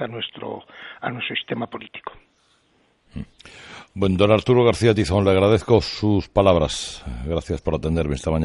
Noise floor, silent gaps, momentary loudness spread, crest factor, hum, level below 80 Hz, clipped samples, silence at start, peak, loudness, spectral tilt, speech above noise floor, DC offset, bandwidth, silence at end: -62 dBFS; none; 21 LU; 20 dB; none; -40 dBFS; under 0.1%; 0 s; -2 dBFS; -20 LUFS; -6 dB/octave; 42 dB; under 0.1%; 11.5 kHz; 0 s